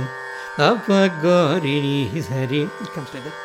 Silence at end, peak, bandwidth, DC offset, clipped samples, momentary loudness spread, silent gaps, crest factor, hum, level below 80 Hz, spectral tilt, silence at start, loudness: 0 s; -2 dBFS; 15.5 kHz; under 0.1%; under 0.1%; 14 LU; none; 18 dB; none; -62 dBFS; -6.5 dB/octave; 0 s; -19 LUFS